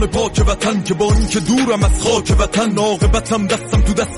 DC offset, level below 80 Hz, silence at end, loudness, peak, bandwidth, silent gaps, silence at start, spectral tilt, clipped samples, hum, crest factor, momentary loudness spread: under 0.1%; -20 dBFS; 0 s; -16 LUFS; -4 dBFS; 11.5 kHz; none; 0 s; -5 dB/octave; under 0.1%; none; 10 dB; 2 LU